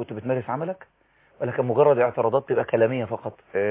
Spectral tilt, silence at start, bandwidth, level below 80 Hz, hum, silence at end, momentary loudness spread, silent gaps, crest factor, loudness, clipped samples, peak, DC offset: -11 dB/octave; 0 s; 3.9 kHz; -62 dBFS; none; 0 s; 13 LU; none; 16 dB; -24 LUFS; under 0.1%; -8 dBFS; under 0.1%